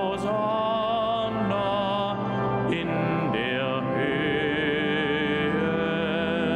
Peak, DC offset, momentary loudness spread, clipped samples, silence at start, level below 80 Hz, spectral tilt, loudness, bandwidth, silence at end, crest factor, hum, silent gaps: -12 dBFS; under 0.1%; 2 LU; under 0.1%; 0 s; -54 dBFS; -7 dB/octave; -25 LUFS; 10.5 kHz; 0 s; 14 dB; none; none